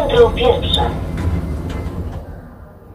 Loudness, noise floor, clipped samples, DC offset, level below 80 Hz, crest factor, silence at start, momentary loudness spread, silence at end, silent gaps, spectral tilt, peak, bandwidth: -17 LUFS; -37 dBFS; under 0.1%; under 0.1%; -26 dBFS; 18 dB; 0 s; 21 LU; 0 s; none; -6.5 dB/octave; 0 dBFS; 15 kHz